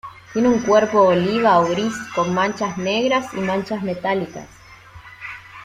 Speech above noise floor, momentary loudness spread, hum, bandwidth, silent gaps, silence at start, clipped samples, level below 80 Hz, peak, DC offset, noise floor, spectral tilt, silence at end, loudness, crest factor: 25 dB; 17 LU; none; 14.5 kHz; none; 0.05 s; under 0.1%; -54 dBFS; -2 dBFS; under 0.1%; -43 dBFS; -5.5 dB/octave; 0 s; -19 LUFS; 16 dB